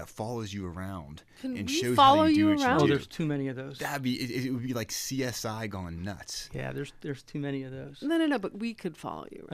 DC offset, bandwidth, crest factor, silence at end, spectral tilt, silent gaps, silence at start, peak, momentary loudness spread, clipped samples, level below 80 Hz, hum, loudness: under 0.1%; 15.5 kHz; 20 dB; 0 s; -5 dB/octave; none; 0 s; -8 dBFS; 17 LU; under 0.1%; -58 dBFS; none; -29 LUFS